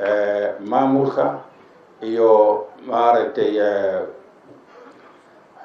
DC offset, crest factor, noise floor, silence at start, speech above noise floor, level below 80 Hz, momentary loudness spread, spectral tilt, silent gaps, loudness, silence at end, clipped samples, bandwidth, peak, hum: under 0.1%; 18 dB; -48 dBFS; 0 s; 31 dB; -74 dBFS; 12 LU; -7.5 dB/octave; none; -18 LUFS; 0 s; under 0.1%; 6.6 kHz; -2 dBFS; none